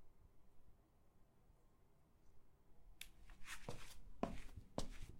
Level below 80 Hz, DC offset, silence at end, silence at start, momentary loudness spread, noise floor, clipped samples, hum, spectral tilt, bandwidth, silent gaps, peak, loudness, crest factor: -60 dBFS; under 0.1%; 0 s; 0 s; 10 LU; -71 dBFS; under 0.1%; none; -4.5 dB/octave; 16 kHz; none; -24 dBFS; -54 LUFS; 28 dB